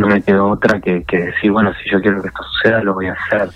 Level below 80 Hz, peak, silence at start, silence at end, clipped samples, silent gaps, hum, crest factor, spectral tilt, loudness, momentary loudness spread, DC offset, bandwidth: -42 dBFS; 0 dBFS; 0 s; 0.05 s; under 0.1%; none; none; 14 dB; -7.5 dB/octave; -15 LUFS; 6 LU; under 0.1%; 8.2 kHz